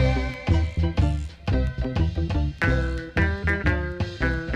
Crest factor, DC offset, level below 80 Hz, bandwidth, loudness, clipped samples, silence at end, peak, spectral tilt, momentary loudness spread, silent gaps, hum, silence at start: 14 dB; under 0.1%; -28 dBFS; 8.4 kHz; -25 LUFS; under 0.1%; 0 s; -8 dBFS; -7.5 dB/octave; 4 LU; none; none; 0 s